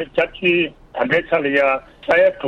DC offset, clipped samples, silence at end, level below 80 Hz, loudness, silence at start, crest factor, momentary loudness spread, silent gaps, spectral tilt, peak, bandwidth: under 0.1%; under 0.1%; 0 s; -50 dBFS; -18 LUFS; 0 s; 16 dB; 9 LU; none; -6.5 dB/octave; -2 dBFS; 6.8 kHz